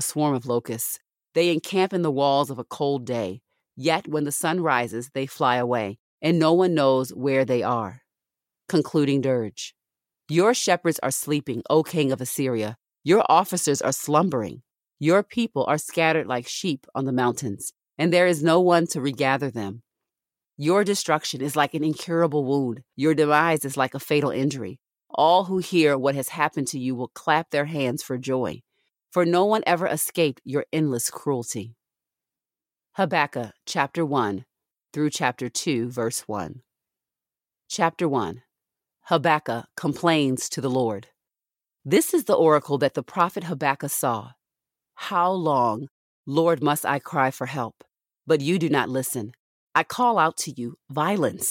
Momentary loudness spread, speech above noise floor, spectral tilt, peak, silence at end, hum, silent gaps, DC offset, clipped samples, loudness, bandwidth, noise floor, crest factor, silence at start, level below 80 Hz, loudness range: 12 LU; over 67 dB; -4.5 dB/octave; -4 dBFS; 0 s; none; 5.99-6.18 s, 45.91-46.24 s, 49.39-49.67 s; under 0.1%; under 0.1%; -23 LUFS; 17 kHz; under -90 dBFS; 20 dB; 0 s; -70 dBFS; 5 LU